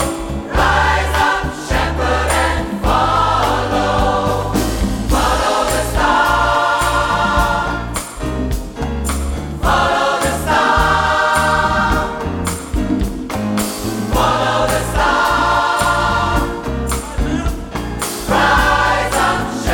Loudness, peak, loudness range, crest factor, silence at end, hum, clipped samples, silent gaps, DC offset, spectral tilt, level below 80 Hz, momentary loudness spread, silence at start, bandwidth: -16 LUFS; -2 dBFS; 3 LU; 14 dB; 0 s; none; under 0.1%; none; under 0.1%; -4.5 dB/octave; -24 dBFS; 8 LU; 0 s; 19 kHz